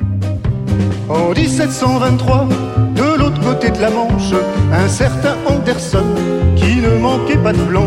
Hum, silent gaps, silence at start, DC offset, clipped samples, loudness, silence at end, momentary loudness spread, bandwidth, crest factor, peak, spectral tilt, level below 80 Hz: none; none; 0 s; under 0.1%; under 0.1%; -14 LUFS; 0 s; 4 LU; 13 kHz; 12 dB; -2 dBFS; -6.5 dB/octave; -26 dBFS